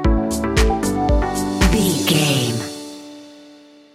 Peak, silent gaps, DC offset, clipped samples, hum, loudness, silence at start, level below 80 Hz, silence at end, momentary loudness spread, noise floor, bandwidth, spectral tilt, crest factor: 0 dBFS; none; under 0.1%; under 0.1%; none; -18 LUFS; 0 s; -24 dBFS; 0.5 s; 17 LU; -45 dBFS; 16 kHz; -4.5 dB/octave; 18 dB